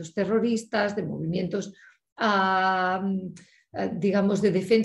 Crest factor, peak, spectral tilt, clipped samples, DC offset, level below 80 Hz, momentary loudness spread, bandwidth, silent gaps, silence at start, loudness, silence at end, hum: 16 dB; -10 dBFS; -6 dB/octave; under 0.1%; under 0.1%; -64 dBFS; 11 LU; 11.5 kHz; 2.12-2.16 s; 0 s; -25 LUFS; 0 s; none